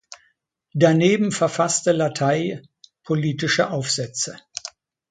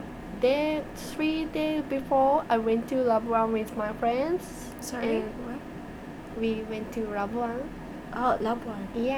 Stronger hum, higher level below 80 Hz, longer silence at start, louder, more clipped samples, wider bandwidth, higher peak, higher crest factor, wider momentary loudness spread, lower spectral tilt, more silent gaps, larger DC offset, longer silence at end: neither; second, -64 dBFS vs -50 dBFS; about the same, 0.1 s vs 0 s; first, -21 LUFS vs -28 LUFS; neither; second, 9.6 kHz vs over 20 kHz; first, -2 dBFS vs -12 dBFS; about the same, 20 dB vs 16 dB; about the same, 16 LU vs 14 LU; about the same, -4.5 dB/octave vs -5.5 dB/octave; neither; neither; first, 0.4 s vs 0 s